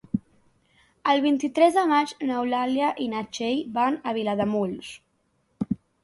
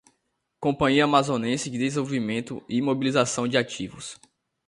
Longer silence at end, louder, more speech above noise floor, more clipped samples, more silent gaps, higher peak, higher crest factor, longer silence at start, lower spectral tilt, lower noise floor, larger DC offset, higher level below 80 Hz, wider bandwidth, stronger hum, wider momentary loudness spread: second, 0.3 s vs 0.55 s; about the same, -25 LUFS vs -24 LUFS; second, 46 dB vs 51 dB; neither; neither; about the same, -6 dBFS vs -4 dBFS; about the same, 20 dB vs 20 dB; second, 0.15 s vs 0.6 s; about the same, -5.5 dB/octave vs -4.5 dB/octave; second, -70 dBFS vs -76 dBFS; neither; about the same, -62 dBFS vs -58 dBFS; about the same, 11.5 kHz vs 11.5 kHz; neither; about the same, 11 LU vs 11 LU